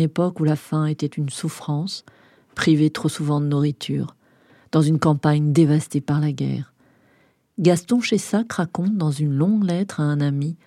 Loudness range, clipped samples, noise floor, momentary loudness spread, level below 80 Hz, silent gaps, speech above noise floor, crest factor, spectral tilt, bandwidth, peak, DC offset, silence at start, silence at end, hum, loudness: 2 LU; under 0.1%; -60 dBFS; 9 LU; -62 dBFS; none; 40 dB; 18 dB; -6.5 dB/octave; 13 kHz; -2 dBFS; under 0.1%; 0 s; 0.1 s; none; -21 LUFS